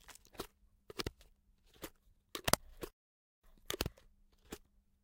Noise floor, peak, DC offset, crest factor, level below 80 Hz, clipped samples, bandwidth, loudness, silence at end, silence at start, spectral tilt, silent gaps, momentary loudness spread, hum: -69 dBFS; -4 dBFS; under 0.1%; 42 dB; -58 dBFS; under 0.1%; 17 kHz; -41 LUFS; 0.45 s; 0.05 s; -2.5 dB/octave; 2.93-3.42 s; 20 LU; none